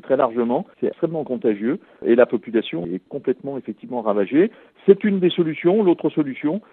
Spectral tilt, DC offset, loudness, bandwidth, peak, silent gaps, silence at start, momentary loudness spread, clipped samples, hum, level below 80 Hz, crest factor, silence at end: -11 dB/octave; under 0.1%; -21 LUFS; 4 kHz; 0 dBFS; none; 0.05 s; 10 LU; under 0.1%; none; -70 dBFS; 20 dB; 0.1 s